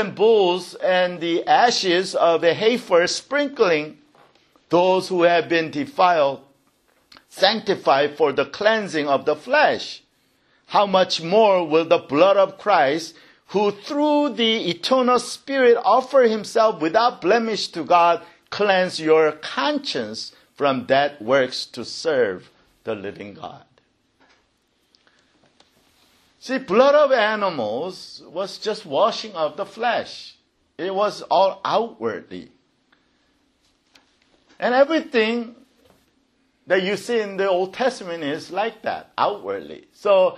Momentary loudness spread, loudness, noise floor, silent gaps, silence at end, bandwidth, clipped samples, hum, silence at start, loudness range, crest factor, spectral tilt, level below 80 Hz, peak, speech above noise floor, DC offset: 14 LU; -20 LUFS; -66 dBFS; none; 0 s; 12.5 kHz; under 0.1%; none; 0 s; 7 LU; 20 dB; -4 dB/octave; -70 dBFS; -2 dBFS; 46 dB; under 0.1%